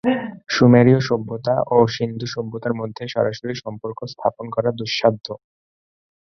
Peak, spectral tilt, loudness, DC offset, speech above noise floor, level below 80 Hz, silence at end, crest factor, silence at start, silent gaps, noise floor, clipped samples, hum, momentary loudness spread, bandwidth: -2 dBFS; -6.5 dB/octave; -20 LUFS; under 0.1%; over 71 dB; -56 dBFS; 0.95 s; 18 dB; 0.05 s; none; under -90 dBFS; under 0.1%; none; 16 LU; 6.6 kHz